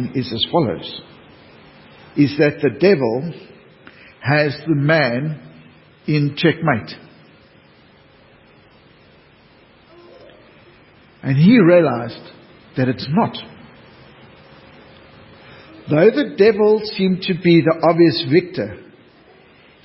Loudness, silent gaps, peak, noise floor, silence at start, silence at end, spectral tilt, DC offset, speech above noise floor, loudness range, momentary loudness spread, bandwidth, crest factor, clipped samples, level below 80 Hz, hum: -16 LUFS; none; 0 dBFS; -50 dBFS; 0 s; 1.05 s; -11 dB/octave; under 0.1%; 34 dB; 10 LU; 18 LU; 5.8 kHz; 18 dB; under 0.1%; -56 dBFS; none